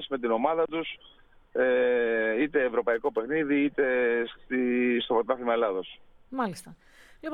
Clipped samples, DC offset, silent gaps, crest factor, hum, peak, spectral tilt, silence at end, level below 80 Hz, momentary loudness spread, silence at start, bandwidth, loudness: under 0.1%; under 0.1%; none; 18 dB; none; -10 dBFS; -5.5 dB/octave; 0 s; -60 dBFS; 11 LU; 0 s; 12 kHz; -27 LUFS